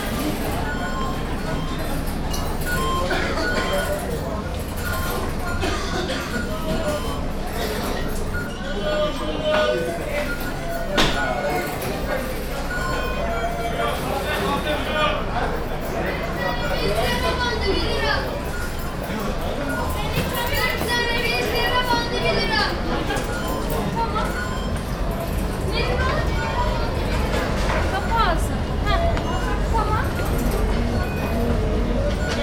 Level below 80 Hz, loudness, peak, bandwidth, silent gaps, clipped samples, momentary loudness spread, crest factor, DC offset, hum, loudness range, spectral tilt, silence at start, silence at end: -28 dBFS; -23 LUFS; -2 dBFS; 18 kHz; none; under 0.1%; 6 LU; 20 dB; under 0.1%; none; 4 LU; -5 dB/octave; 0 s; 0 s